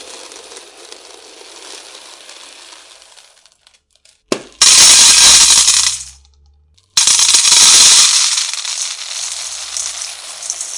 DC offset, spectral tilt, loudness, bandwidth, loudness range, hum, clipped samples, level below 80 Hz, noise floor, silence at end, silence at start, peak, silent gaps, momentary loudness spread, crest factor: under 0.1%; 2.5 dB/octave; -6 LUFS; 12 kHz; 4 LU; none; 0.9%; -48 dBFS; -53 dBFS; 0 s; 0 s; 0 dBFS; none; 20 LU; 14 dB